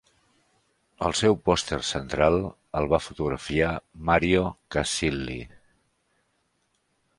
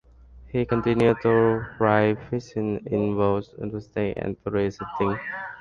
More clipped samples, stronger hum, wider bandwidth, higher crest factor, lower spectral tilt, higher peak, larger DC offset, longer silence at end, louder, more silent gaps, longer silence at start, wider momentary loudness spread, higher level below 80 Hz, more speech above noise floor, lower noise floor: neither; neither; first, 11.5 kHz vs 7.2 kHz; about the same, 22 dB vs 18 dB; second, -4.5 dB/octave vs -8.5 dB/octave; about the same, -6 dBFS vs -6 dBFS; neither; first, 1.7 s vs 0 s; about the same, -25 LUFS vs -25 LUFS; neither; first, 1 s vs 0.3 s; about the same, 9 LU vs 10 LU; first, -44 dBFS vs -50 dBFS; first, 47 dB vs 24 dB; first, -72 dBFS vs -48 dBFS